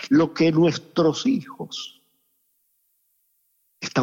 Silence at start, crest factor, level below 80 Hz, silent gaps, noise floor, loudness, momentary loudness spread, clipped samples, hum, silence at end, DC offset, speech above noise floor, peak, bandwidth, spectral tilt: 0 s; 16 dB; -68 dBFS; none; -69 dBFS; -22 LUFS; 15 LU; under 0.1%; none; 0 s; under 0.1%; 48 dB; -8 dBFS; 7.6 kHz; -6 dB/octave